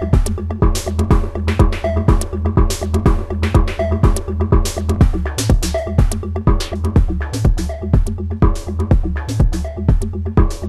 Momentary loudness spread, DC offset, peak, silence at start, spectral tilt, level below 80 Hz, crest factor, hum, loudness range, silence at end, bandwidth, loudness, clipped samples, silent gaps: 4 LU; under 0.1%; 0 dBFS; 0 s; -6.5 dB/octave; -18 dBFS; 14 dB; none; 1 LU; 0 s; 13.5 kHz; -18 LUFS; under 0.1%; none